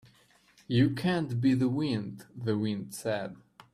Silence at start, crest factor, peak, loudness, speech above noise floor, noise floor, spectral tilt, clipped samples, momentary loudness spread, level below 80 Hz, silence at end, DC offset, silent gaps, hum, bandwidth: 0.7 s; 18 dB; -14 dBFS; -30 LUFS; 34 dB; -63 dBFS; -7 dB/octave; under 0.1%; 9 LU; -66 dBFS; 0.35 s; under 0.1%; none; none; 14 kHz